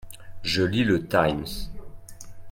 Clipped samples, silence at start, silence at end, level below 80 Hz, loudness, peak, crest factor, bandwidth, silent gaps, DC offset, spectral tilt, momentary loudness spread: under 0.1%; 0 s; 0 s; -44 dBFS; -24 LUFS; -4 dBFS; 22 dB; 17 kHz; none; under 0.1%; -5.5 dB/octave; 23 LU